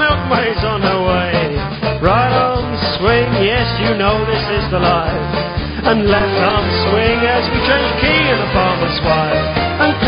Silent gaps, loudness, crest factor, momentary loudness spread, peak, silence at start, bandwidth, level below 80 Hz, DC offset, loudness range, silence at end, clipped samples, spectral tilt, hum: none; -14 LUFS; 14 dB; 5 LU; 0 dBFS; 0 s; 5.4 kHz; -28 dBFS; under 0.1%; 1 LU; 0 s; under 0.1%; -9.5 dB/octave; none